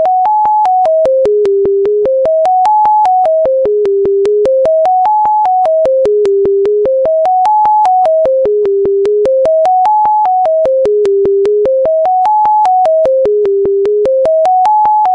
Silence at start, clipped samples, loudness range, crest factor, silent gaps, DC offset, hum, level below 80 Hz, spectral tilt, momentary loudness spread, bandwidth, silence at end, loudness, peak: 0 s; under 0.1%; 0 LU; 8 dB; none; under 0.1%; none; -46 dBFS; -6.5 dB/octave; 2 LU; 8.4 kHz; 0 s; -10 LUFS; -2 dBFS